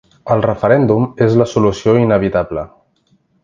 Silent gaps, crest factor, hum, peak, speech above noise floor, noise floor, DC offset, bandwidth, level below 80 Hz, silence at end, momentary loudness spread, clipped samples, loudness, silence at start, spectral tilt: none; 14 dB; none; 0 dBFS; 45 dB; -58 dBFS; under 0.1%; 7.6 kHz; -42 dBFS; 0.8 s; 8 LU; under 0.1%; -14 LUFS; 0.25 s; -8 dB/octave